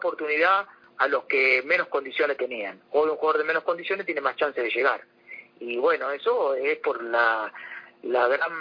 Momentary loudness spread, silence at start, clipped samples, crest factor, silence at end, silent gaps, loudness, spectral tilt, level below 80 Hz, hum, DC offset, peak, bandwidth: 13 LU; 0 s; under 0.1%; 18 dB; 0 s; none; -24 LUFS; -4.5 dB/octave; -74 dBFS; none; under 0.1%; -8 dBFS; 5.2 kHz